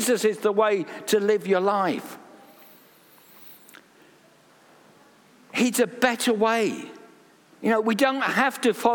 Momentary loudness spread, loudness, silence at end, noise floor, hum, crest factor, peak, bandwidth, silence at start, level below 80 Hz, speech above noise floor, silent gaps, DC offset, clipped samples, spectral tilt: 18 LU; -23 LUFS; 0 s; -56 dBFS; none; 22 dB; -4 dBFS; 19.5 kHz; 0 s; -74 dBFS; 33 dB; none; under 0.1%; under 0.1%; -3.5 dB/octave